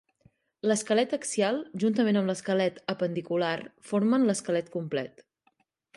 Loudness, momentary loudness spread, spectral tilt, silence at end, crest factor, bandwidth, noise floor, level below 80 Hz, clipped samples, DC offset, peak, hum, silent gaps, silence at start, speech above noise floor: -28 LUFS; 8 LU; -5 dB/octave; 0.9 s; 16 dB; 11.5 kHz; -71 dBFS; -74 dBFS; under 0.1%; under 0.1%; -12 dBFS; none; none; 0.65 s; 44 dB